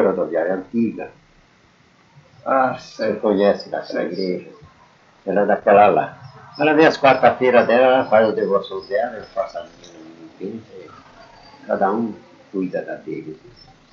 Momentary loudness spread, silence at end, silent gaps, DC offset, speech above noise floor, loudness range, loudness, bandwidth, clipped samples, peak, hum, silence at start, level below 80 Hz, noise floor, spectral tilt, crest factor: 19 LU; 0.55 s; none; under 0.1%; 36 dB; 12 LU; -18 LUFS; 7.2 kHz; under 0.1%; 0 dBFS; none; 0 s; -62 dBFS; -54 dBFS; -6.5 dB/octave; 20 dB